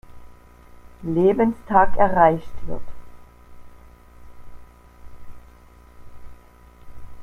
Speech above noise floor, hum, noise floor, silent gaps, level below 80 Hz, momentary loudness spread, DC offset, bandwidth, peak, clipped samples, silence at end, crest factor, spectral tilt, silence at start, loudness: 31 dB; 60 Hz at -55 dBFS; -48 dBFS; none; -40 dBFS; 20 LU; under 0.1%; 4 kHz; -2 dBFS; under 0.1%; 0 s; 22 dB; -8.5 dB/octave; 0.1 s; -19 LUFS